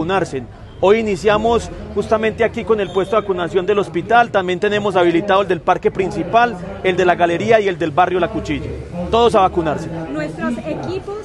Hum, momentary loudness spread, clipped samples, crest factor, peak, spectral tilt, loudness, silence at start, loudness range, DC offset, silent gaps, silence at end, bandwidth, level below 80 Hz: none; 10 LU; under 0.1%; 16 dB; 0 dBFS; -6 dB/octave; -17 LUFS; 0 s; 2 LU; under 0.1%; none; 0 s; 11.5 kHz; -38 dBFS